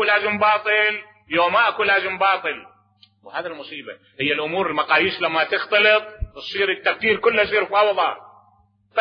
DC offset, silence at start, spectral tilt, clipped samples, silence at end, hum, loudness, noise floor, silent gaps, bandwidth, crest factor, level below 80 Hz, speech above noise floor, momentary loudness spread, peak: under 0.1%; 0 s; -6 dB/octave; under 0.1%; 0 s; none; -19 LUFS; -59 dBFS; none; 6.4 kHz; 16 dB; -46 dBFS; 39 dB; 16 LU; -4 dBFS